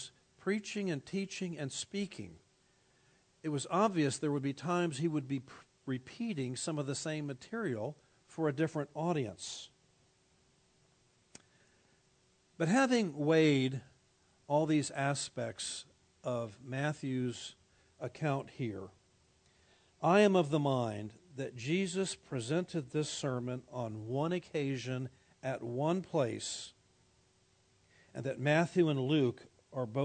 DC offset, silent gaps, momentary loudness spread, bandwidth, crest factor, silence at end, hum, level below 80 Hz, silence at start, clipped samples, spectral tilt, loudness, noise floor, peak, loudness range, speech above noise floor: under 0.1%; none; 15 LU; 9.4 kHz; 22 dB; 0 s; none; -76 dBFS; 0 s; under 0.1%; -5.5 dB/octave; -35 LUFS; -71 dBFS; -14 dBFS; 7 LU; 37 dB